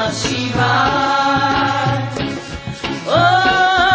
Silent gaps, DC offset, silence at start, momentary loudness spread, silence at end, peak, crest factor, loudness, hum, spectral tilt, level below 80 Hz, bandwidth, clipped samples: none; under 0.1%; 0 s; 11 LU; 0 s; -2 dBFS; 14 dB; -15 LUFS; none; -4.5 dB/octave; -38 dBFS; 8 kHz; under 0.1%